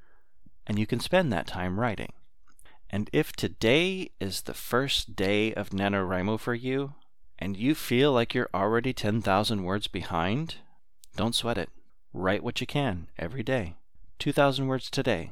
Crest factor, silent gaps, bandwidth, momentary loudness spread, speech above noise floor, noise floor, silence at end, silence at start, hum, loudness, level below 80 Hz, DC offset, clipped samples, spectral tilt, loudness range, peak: 20 dB; none; 17.5 kHz; 12 LU; 30 dB; -58 dBFS; 0 s; 0.05 s; none; -28 LUFS; -50 dBFS; 0.8%; under 0.1%; -5.5 dB/octave; 4 LU; -10 dBFS